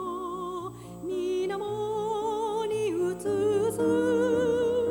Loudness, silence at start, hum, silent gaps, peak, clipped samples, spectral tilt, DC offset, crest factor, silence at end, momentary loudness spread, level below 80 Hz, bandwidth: -28 LUFS; 0 s; 60 Hz at -55 dBFS; none; -16 dBFS; under 0.1%; -6 dB/octave; under 0.1%; 12 dB; 0 s; 10 LU; -60 dBFS; 18.5 kHz